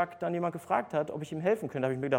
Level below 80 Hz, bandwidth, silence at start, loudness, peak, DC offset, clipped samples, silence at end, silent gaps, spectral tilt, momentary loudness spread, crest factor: -72 dBFS; 17 kHz; 0 s; -32 LUFS; -12 dBFS; under 0.1%; under 0.1%; 0 s; none; -7 dB/octave; 3 LU; 18 dB